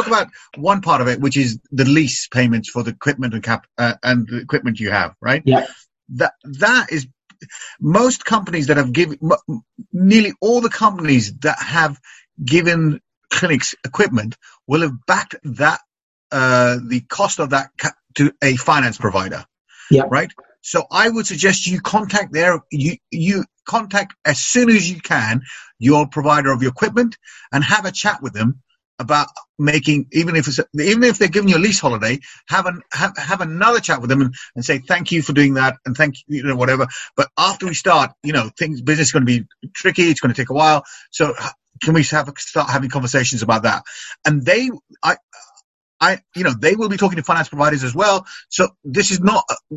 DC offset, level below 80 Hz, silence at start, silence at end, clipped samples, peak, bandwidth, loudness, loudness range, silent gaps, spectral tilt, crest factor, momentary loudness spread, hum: under 0.1%; -52 dBFS; 0 s; 0 s; under 0.1%; 0 dBFS; 8.6 kHz; -17 LUFS; 2 LU; 13.17-13.21 s, 16.03-16.30 s, 19.60-19.65 s, 28.85-28.98 s, 29.49-29.55 s, 45.23-45.28 s, 45.64-46.00 s; -4.5 dB/octave; 18 dB; 9 LU; none